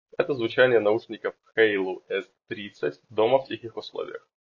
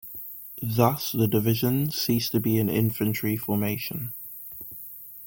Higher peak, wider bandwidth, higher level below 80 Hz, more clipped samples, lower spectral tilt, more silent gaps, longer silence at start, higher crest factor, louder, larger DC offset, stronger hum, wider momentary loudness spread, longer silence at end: about the same, -6 dBFS vs -6 dBFS; second, 7 kHz vs 17 kHz; second, -72 dBFS vs -58 dBFS; neither; about the same, -6.5 dB/octave vs -6 dB/octave; neither; first, 0.2 s vs 0.05 s; about the same, 20 dB vs 20 dB; about the same, -25 LUFS vs -25 LUFS; neither; neither; about the same, 16 LU vs 14 LU; first, 0.35 s vs 0 s